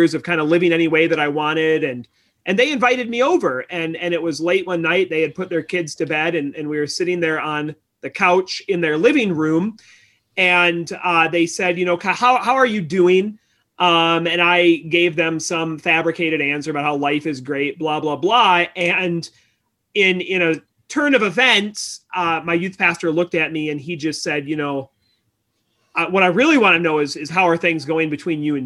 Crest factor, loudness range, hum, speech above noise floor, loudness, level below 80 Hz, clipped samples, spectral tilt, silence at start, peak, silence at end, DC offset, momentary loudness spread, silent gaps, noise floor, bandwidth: 16 dB; 4 LU; none; 51 dB; -18 LUFS; -64 dBFS; under 0.1%; -4.5 dB/octave; 0 s; -2 dBFS; 0 s; under 0.1%; 10 LU; none; -69 dBFS; 12 kHz